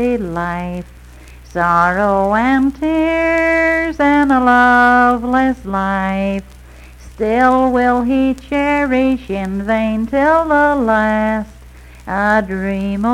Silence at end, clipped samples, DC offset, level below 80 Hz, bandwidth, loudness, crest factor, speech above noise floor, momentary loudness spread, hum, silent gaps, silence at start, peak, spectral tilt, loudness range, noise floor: 0 s; under 0.1%; under 0.1%; -36 dBFS; 13 kHz; -14 LUFS; 14 dB; 24 dB; 10 LU; none; none; 0 s; 0 dBFS; -6.5 dB/octave; 4 LU; -38 dBFS